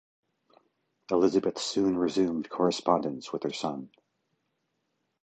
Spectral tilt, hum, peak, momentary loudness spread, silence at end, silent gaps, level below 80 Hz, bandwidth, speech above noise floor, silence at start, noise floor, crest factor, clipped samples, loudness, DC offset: -5 dB/octave; none; -8 dBFS; 9 LU; 1.35 s; none; -66 dBFS; 9 kHz; 51 dB; 1.1 s; -79 dBFS; 22 dB; under 0.1%; -28 LUFS; under 0.1%